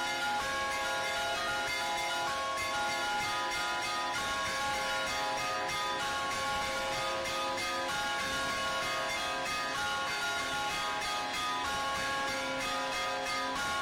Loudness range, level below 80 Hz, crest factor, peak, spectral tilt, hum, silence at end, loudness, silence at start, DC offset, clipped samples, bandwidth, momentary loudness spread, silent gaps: 0 LU; -58 dBFS; 10 dB; -24 dBFS; -1.5 dB/octave; none; 0 s; -32 LUFS; 0 s; under 0.1%; under 0.1%; 16 kHz; 1 LU; none